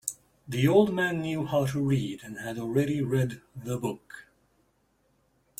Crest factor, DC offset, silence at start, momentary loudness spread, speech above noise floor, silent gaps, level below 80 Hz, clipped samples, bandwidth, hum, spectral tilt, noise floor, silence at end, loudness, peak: 20 dB; under 0.1%; 0.05 s; 18 LU; 42 dB; none; -60 dBFS; under 0.1%; 16.5 kHz; none; -6 dB/octave; -70 dBFS; 1.4 s; -28 LUFS; -8 dBFS